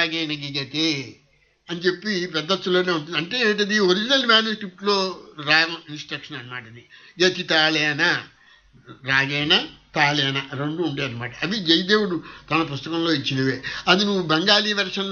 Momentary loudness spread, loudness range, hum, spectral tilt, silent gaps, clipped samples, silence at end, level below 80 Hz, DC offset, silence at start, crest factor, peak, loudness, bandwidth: 12 LU; 3 LU; none; -4 dB/octave; none; under 0.1%; 0 s; -60 dBFS; under 0.1%; 0 s; 20 dB; -2 dBFS; -21 LUFS; 7.2 kHz